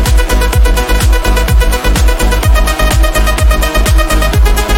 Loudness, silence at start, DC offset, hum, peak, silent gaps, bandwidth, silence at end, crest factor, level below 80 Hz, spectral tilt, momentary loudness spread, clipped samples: -11 LUFS; 0 s; under 0.1%; none; 0 dBFS; none; 17 kHz; 0 s; 8 dB; -10 dBFS; -4.5 dB/octave; 1 LU; under 0.1%